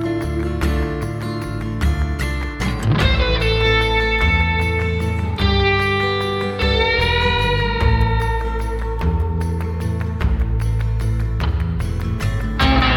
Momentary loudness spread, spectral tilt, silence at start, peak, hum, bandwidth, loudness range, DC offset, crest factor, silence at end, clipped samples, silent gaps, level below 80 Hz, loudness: 7 LU; -6 dB/octave; 0 s; -2 dBFS; none; 14 kHz; 4 LU; under 0.1%; 16 dB; 0 s; under 0.1%; none; -22 dBFS; -19 LUFS